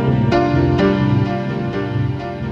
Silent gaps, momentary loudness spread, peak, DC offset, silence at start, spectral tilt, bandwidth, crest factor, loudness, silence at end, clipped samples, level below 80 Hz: none; 7 LU; -2 dBFS; under 0.1%; 0 s; -8.5 dB/octave; 7 kHz; 14 dB; -17 LUFS; 0 s; under 0.1%; -34 dBFS